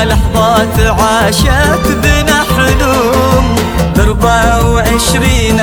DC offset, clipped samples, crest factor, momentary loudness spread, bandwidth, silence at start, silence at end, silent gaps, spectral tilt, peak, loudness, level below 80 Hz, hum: under 0.1%; under 0.1%; 8 dB; 2 LU; over 20 kHz; 0 s; 0 s; none; -4.5 dB/octave; 0 dBFS; -9 LUFS; -16 dBFS; none